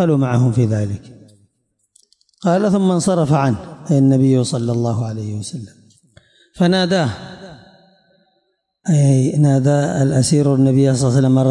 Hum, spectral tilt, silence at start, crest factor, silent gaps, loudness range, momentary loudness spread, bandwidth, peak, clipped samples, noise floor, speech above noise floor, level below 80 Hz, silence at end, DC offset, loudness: none; -7 dB/octave; 0 s; 12 dB; none; 6 LU; 12 LU; 11.5 kHz; -6 dBFS; under 0.1%; -67 dBFS; 52 dB; -54 dBFS; 0 s; under 0.1%; -16 LUFS